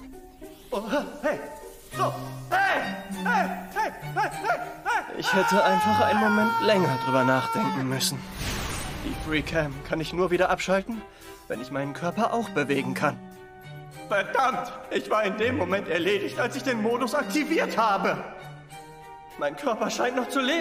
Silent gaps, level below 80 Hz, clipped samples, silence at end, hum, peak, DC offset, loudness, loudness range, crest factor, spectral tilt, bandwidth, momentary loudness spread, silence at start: none; -50 dBFS; under 0.1%; 0 s; none; -8 dBFS; under 0.1%; -26 LUFS; 5 LU; 18 dB; -4.5 dB/octave; 16 kHz; 20 LU; 0 s